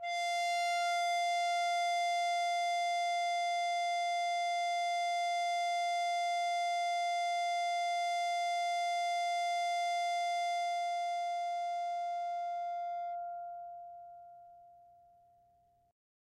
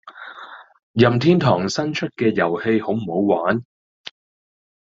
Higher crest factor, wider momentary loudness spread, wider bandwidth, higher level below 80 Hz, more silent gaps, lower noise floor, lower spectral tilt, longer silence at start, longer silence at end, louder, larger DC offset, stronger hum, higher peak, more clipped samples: second, 10 dB vs 20 dB; second, 7 LU vs 23 LU; first, 13.5 kHz vs 7.8 kHz; second, -86 dBFS vs -58 dBFS; second, none vs 0.83-0.94 s; first, -70 dBFS vs -40 dBFS; second, 2.5 dB/octave vs -6.5 dB/octave; about the same, 0 s vs 0.05 s; first, 1.6 s vs 1.3 s; second, -34 LUFS vs -19 LUFS; neither; first, 60 Hz at -85 dBFS vs none; second, -24 dBFS vs -2 dBFS; neither